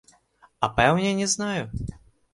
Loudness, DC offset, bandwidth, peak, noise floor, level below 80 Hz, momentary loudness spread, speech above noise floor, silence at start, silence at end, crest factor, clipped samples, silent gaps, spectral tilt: -24 LUFS; under 0.1%; 11.5 kHz; -4 dBFS; -59 dBFS; -44 dBFS; 14 LU; 36 dB; 0.6 s; 0.4 s; 22 dB; under 0.1%; none; -4 dB/octave